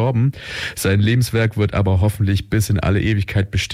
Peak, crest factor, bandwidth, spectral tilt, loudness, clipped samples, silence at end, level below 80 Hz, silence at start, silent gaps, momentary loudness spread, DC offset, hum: -8 dBFS; 10 dB; 16 kHz; -6 dB/octave; -18 LUFS; under 0.1%; 0 s; -36 dBFS; 0 s; none; 4 LU; under 0.1%; none